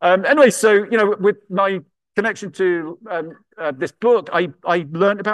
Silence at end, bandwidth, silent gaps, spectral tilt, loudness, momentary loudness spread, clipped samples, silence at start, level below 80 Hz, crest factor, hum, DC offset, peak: 0 s; 12.5 kHz; none; -4.5 dB/octave; -18 LUFS; 14 LU; under 0.1%; 0 s; -68 dBFS; 16 dB; none; under 0.1%; -2 dBFS